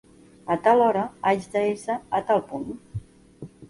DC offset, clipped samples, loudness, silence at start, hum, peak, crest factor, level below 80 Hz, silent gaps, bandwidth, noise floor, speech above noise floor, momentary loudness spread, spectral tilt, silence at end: under 0.1%; under 0.1%; -24 LUFS; 0.45 s; none; -8 dBFS; 18 dB; -56 dBFS; none; 11.5 kHz; -45 dBFS; 21 dB; 20 LU; -6 dB/octave; 0.05 s